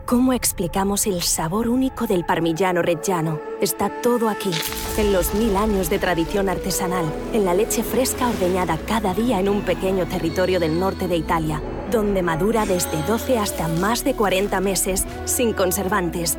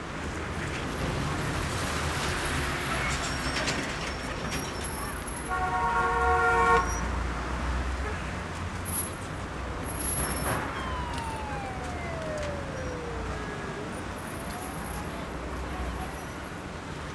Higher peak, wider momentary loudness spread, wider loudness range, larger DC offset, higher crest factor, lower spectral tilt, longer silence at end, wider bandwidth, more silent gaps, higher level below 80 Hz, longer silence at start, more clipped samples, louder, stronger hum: first, -8 dBFS vs -12 dBFS; second, 3 LU vs 10 LU; second, 1 LU vs 8 LU; neither; second, 12 dB vs 18 dB; about the same, -4.5 dB/octave vs -4 dB/octave; about the same, 0 s vs 0 s; first, over 20 kHz vs 11 kHz; neither; about the same, -36 dBFS vs -38 dBFS; about the same, 0 s vs 0 s; neither; first, -21 LUFS vs -30 LUFS; neither